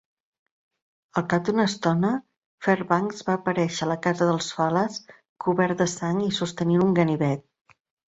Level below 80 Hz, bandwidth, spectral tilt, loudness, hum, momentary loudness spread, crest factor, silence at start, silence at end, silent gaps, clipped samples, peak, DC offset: -62 dBFS; 8 kHz; -6 dB/octave; -24 LUFS; none; 7 LU; 20 dB; 1.15 s; 0.8 s; 2.45-2.58 s, 5.29-5.36 s; under 0.1%; -6 dBFS; under 0.1%